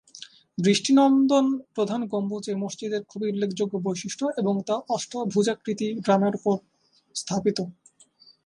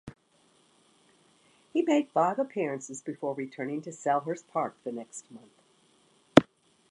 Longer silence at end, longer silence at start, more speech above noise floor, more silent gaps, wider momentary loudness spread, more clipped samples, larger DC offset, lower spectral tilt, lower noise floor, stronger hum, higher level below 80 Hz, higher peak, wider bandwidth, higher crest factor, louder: first, 0.75 s vs 0.5 s; about the same, 0.15 s vs 0.05 s; about the same, 32 dB vs 35 dB; neither; second, 12 LU vs 17 LU; neither; neither; about the same, -5.5 dB/octave vs -5.5 dB/octave; second, -57 dBFS vs -66 dBFS; neither; about the same, -70 dBFS vs -66 dBFS; second, -6 dBFS vs -2 dBFS; about the same, 11 kHz vs 11.5 kHz; second, 18 dB vs 30 dB; first, -25 LUFS vs -29 LUFS